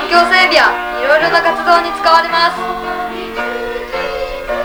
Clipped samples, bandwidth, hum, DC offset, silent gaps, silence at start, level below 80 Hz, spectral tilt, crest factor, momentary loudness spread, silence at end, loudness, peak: under 0.1%; over 20 kHz; none; under 0.1%; none; 0 s; -38 dBFS; -2.5 dB/octave; 14 dB; 12 LU; 0 s; -13 LUFS; 0 dBFS